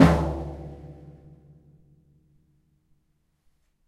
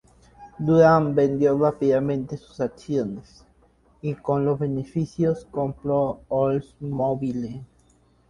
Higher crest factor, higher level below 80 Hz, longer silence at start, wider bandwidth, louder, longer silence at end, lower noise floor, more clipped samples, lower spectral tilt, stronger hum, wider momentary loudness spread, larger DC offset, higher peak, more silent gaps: first, 26 dB vs 20 dB; first, -38 dBFS vs -54 dBFS; second, 0 s vs 0.4 s; first, 12 kHz vs 10.5 kHz; second, -26 LUFS vs -23 LUFS; first, 2.95 s vs 0.65 s; first, -70 dBFS vs -59 dBFS; neither; second, -7.5 dB/octave vs -9 dB/octave; neither; first, 26 LU vs 14 LU; neither; about the same, -2 dBFS vs -4 dBFS; neither